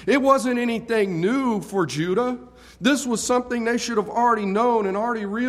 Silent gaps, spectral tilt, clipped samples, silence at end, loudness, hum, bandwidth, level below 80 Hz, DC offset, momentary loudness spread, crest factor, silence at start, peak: none; -4.5 dB/octave; under 0.1%; 0 s; -22 LUFS; none; 15 kHz; -56 dBFS; under 0.1%; 5 LU; 18 dB; 0 s; -4 dBFS